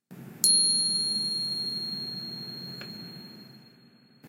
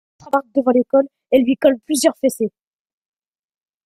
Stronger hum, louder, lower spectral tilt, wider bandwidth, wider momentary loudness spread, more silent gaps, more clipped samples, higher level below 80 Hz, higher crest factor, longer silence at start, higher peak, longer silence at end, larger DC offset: neither; second, -25 LUFS vs -18 LUFS; second, -0.5 dB/octave vs -4 dB/octave; about the same, 16 kHz vs 15.5 kHz; first, 22 LU vs 7 LU; neither; neither; second, -78 dBFS vs -60 dBFS; first, 26 dB vs 18 dB; second, 0.1 s vs 0.25 s; second, -6 dBFS vs -2 dBFS; second, 0 s vs 1.4 s; neither